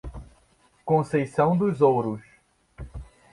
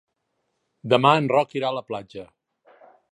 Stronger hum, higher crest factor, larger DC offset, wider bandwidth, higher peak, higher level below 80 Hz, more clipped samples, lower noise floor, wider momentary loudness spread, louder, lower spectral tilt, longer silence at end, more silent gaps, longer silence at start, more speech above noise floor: neither; about the same, 18 dB vs 22 dB; neither; about the same, 11.5 kHz vs 11 kHz; second, -8 dBFS vs -2 dBFS; first, -48 dBFS vs -70 dBFS; neither; second, -62 dBFS vs -76 dBFS; about the same, 23 LU vs 23 LU; about the same, -23 LUFS vs -21 LUFS; first, -8.5 dB/octave vs -6.5 dB/octave; second, 0.3 s vs 0.9 s; neither; second, 0.05 s vs 0.85 s; second, 40 dB vs 54 dB